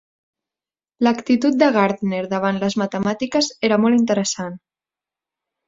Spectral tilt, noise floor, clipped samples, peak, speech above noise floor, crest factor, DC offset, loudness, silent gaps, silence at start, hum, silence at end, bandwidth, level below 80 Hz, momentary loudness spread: -5 dB/octave; under -90 dBFS; under 0.1%; -2 dBFS; over 72 dB; 18 dB; under 0.1%; -19 LUFS; none; 1 s; none; 1.1 s; 7.8 kHz; -62 dBFS; 7 LU